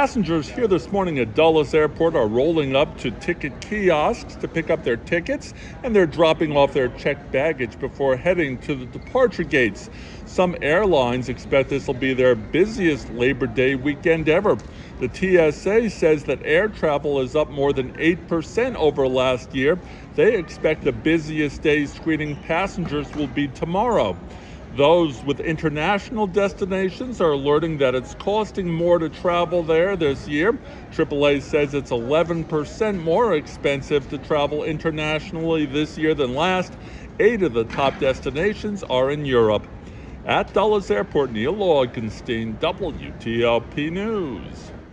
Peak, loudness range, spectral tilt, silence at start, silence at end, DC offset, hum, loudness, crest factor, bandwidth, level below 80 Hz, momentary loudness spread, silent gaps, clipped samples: -4 dBFS; 2 LU; -6 dB/octave; 0 s; 0 s; under 0.1%; none; -21 LUFS; 16 dB; 9.6 kHz; -42 dBFS; 8 LU; none; under 0.1%